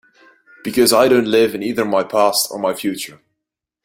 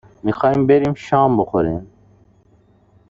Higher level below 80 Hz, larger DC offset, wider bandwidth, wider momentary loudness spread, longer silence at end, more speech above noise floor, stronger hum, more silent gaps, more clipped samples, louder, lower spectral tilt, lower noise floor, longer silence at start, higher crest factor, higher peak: second, -58 dBFS vs -46 dBFS; neither; first, 16.5 kHz vs 7.6 kHz; first, 12 LU vs 9 LU; second, 0.75 s vs 1.25 s; first, 65 dB vs 38 dB; neither; neither; neither; about the same, -16 LUFS vs -17 LUFS; second, -3 dB/octave vs -8.5 dB/octave; first, -81 dBFS vs -54 dBFS; first, 0.65 s vs 0.25 s; about the same, 16 dB vs 16 dB; about the same, 0 dBFS vs -2 dBFS